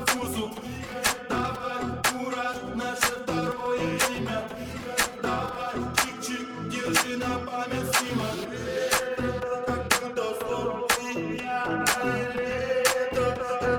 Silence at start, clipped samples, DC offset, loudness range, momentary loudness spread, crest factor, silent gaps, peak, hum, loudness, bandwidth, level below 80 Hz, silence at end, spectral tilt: 0 s; under 0.1%; under 0.1%; 2 LU; 7 LU; 24 dB; none; -4 dBFS; none; -27 LUFS; over 20 kHz; -50 dBFS; 0 s; -3 dB/octave